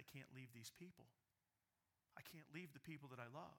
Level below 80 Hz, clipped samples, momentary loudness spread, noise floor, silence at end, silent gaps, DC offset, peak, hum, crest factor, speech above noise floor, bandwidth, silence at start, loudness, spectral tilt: under -90 dBFS; under 0.1%; 7 LU; under -90 dBFS; 0 s; none; under 0.1%; -38 dBFS; none; 22 dB; over 30 dB; 19 kHz; 0 s; -59 LUFS; -4.5 dB/octave